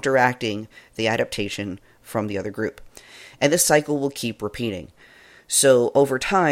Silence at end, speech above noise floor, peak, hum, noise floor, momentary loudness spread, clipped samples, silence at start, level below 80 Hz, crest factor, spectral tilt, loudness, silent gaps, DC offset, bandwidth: 0 s; 28 dB; -2 dBFS; none; -50 dBFS; 16 LU; under 0.1%; 0.05 s; -54 dBFS; 20 dB; -3.5 dB/octave; -21 LUFS; none; under 0.1%; 16.5 kHz